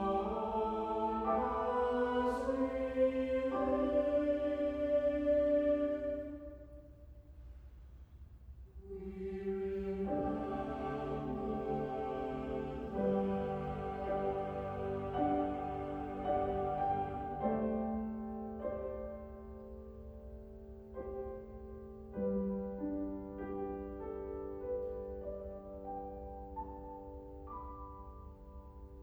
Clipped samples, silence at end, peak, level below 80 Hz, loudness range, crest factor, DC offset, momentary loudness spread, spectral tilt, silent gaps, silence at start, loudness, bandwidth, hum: under 0.1%; 0 s; -22 dBFS; -54 dBFS; 12 LU; 16 dB; under 0.1%; 19 LU; -8.5 dB/octave; none; 0 s; -37 LUFS; 8.8 kHz; none